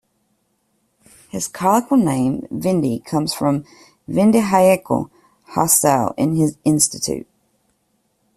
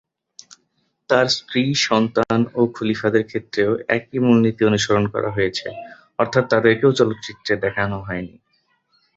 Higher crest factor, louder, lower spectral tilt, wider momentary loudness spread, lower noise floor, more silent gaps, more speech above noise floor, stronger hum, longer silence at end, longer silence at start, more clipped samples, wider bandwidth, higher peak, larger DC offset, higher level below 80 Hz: about the same, 18 dB vs 20 dB; about the same, -18 LUFS vs -19 LUFS; about the same, -5 dB/octave vs -5 dB/octave; about the same, 11 LU vs 12 LU; about the same, -66 dBFS vs -68 dBFS; neither; about the same, 49 dB vs 49 dB; neither; first, 1.15 s vs 0.9 s; first, 1.35 s vs 1.1 s; neither; first, 15.5 kHz vs 8 kHz; about the same, 0 dBFS vs 0 dBFS; neither; about the same, -54 dBFS vs -52 dBFS